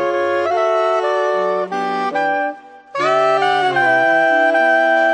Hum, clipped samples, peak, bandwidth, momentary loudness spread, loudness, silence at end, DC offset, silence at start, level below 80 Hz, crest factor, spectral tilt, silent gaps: none; under 0.1%; -4 dBFS; 10 kHz; 7 LU; -16 LUFS; 0 s; under 0.1%; 0 s; -68 dBFS; 12 dB; -4.5 dB/octave; none